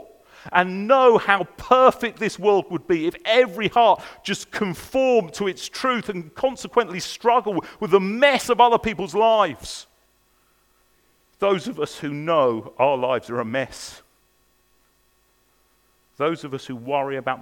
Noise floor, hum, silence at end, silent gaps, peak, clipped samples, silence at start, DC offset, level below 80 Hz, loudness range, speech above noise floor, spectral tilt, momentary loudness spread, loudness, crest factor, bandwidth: -63 dBFS; none; 0 s; none; 0 dBFS; under 0.1%; 0.45 s; under 0.1%; -56 dBFS; 11 LU; 42 dB; -4.5 dB/octave; 12 LU; -21 LUFS; 22 dB; 18 kHz